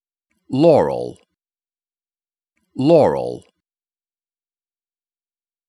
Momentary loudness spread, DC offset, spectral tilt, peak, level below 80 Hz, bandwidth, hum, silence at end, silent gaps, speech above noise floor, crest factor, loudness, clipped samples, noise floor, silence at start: 19 LU; under 0.1%; -8 dB/octave; -2 dBFS; -58 dBFS; 11 kHz; none; 2.3 s; none; over 75 dB; 20 dB; -16 LUFS; under 0.1%; under -90 dBFS; 0.5 s